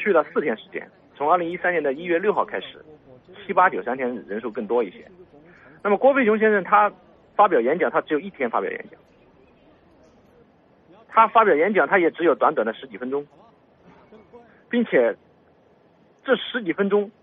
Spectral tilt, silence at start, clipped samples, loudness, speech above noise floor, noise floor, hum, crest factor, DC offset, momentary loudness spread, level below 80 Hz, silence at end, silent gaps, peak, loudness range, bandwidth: -3.5 dB/octave; 0 s; under 0.1%; -21 LUFS; 36 dB; -57 dBFS; none; 20 dB; under 0.1%; 13 LU; -68 dBFS; 0.1 s; none; -2 dBFS; 7 LU; 3.9 kHz